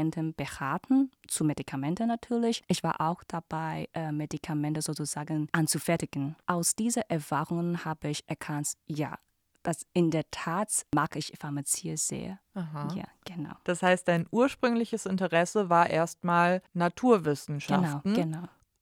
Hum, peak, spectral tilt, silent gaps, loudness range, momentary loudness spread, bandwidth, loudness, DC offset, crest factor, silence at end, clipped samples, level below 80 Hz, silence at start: none; -10 dBFS; -5 dB/octave; none; 5 LU; 11 LU; 17.5 kHz; -30 LUFS; under 0.1%; 20 dB; 0.35 s; under 0.1%; -64 dBFS; 0 s